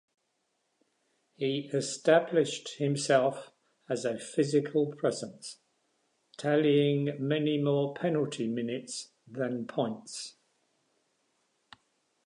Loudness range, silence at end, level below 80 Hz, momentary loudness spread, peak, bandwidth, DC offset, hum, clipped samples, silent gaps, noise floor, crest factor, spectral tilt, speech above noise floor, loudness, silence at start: 8 LU; 1.95 s; -82 dBFS; 15 LU; -10 dBFS; 11 kHz; under 0.1%; none; under 0.1%; none; -78 dBFS; 22 dB; -5.5 dB/octave; 49 dB; -30 LUFS; 1.4 s